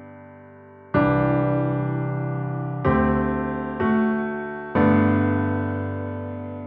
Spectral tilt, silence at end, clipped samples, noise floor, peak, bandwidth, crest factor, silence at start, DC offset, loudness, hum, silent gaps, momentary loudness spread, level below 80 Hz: -12 dB/octave; 0 s; under 0.1%; -45 dBFS; -6 dBFS; 4.5 kHz; 16 dB; 0 s; under 0.1%; -23 LUFS; none; none; 10 LU; -42 dBFS